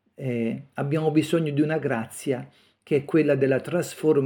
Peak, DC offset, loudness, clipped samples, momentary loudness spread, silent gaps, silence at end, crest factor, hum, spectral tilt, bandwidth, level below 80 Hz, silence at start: -8 dBFS; under 0.1%; -25 LUFS; under 0.1%; 8 LU; none; 0 s; 16 dB; none; -7 dB/octave; 18 kHz; -72 dBFS; 0.2 s